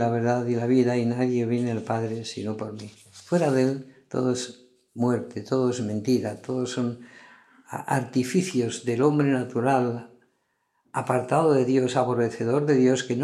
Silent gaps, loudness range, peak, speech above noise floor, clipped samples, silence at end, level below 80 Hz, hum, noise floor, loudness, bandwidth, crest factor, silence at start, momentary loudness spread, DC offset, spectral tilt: none; 4 LU; -6 dBFS; 49 dB; under 0.1%; 0 s; -74 dBFS; none; -73 dBFS; -25 LUFS; 12.5 kHz; 18 dB; 0 s; 12 LU; under 0.1%; -6.5 dB/octave